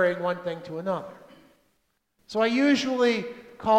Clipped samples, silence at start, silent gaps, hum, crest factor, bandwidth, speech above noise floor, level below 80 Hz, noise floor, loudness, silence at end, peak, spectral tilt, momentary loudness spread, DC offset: under 0.1%; 0 s; none; none; 16 dB; 10 kHz; 47 dB; -66 dBFS; -73 dBFS; -26 LUFS; 0 s; -10 dBFS; -5 dB/octave; 11 LU; under 0.1%